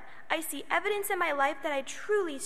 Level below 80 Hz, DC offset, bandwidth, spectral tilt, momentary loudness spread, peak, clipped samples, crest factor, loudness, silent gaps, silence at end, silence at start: -70 dBFS; 0.8%; 15.5 kHz; -1.5 dB/octave; 5 LU; -10 dBFS; under 0.1%; 20 dB; -31 LUFS; none; 0 s; 0 s